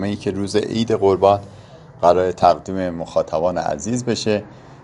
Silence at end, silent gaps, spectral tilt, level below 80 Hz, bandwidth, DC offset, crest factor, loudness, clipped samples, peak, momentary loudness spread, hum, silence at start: 0.05 s; none; -5.5 dB/octave; -50 dBFS; 11.5 kHz; under 0.1%; 18 dB; -19 LUFS; under 0.1%; 0 dBFS; 8 LU; none; 0 s